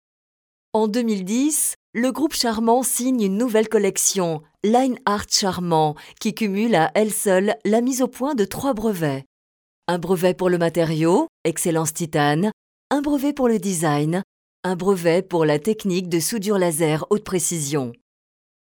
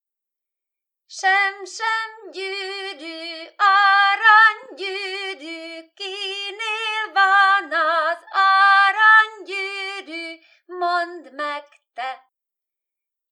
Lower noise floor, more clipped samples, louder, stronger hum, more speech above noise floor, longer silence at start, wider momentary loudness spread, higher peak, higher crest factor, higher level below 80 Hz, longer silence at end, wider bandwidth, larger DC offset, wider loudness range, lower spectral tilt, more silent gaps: first, under -90 dBFS vs -86 dBFS; neither; second, -21 LUFS vs -17 LUFS; neither; first, over 70 dB vs 63 dB; second, 0.75 s vs 1.1 s; second, 7 LU vs 19 LU; about the same, -4 dBFS vs -2 dBFS; about the same, 16 dB vs 18 dB; first, -56 dBFS vs under -90 dBFS; second, 0.75 s vs 1.15 s; first, over 20 kHz vs 11 kHz; neither; second, 2 LU vs 11 LU; first, -4.5 dB/octave vs 2.5 dB/octave; first, 1.76-1.93 s, 9.26-9.82 s, 11.29-11.44 s, 12.53-12.90 s, 14.24-14.63 s vs none